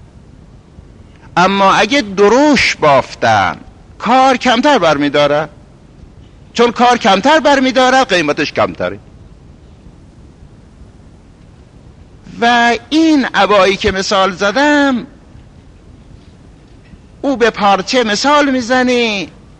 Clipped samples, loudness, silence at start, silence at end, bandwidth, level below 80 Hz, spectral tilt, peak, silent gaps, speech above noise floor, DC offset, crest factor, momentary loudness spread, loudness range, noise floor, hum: under 0.1%; -11 LUFS; 1.35 s; 0.3 s; 10.5 kHz; -42 dBFS; -4 dB/octave; 0 dBFS; none; 29 dB; under 0.1%; 14 dB; 8 LU; 7 LU; -40 dBFS; none